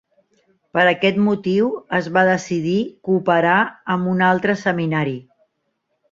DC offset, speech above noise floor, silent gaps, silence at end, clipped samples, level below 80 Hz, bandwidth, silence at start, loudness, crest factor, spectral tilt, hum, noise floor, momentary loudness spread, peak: under 0.1%; 54 dB; none; 0.9 s; under 0.1%; -60 dBFS; 7.6 kHz; 0.75 s; -18 LUFS; 18 dB; -6.5 dB/octave; none; -72 dBFS; 7 LU; -2 dBFS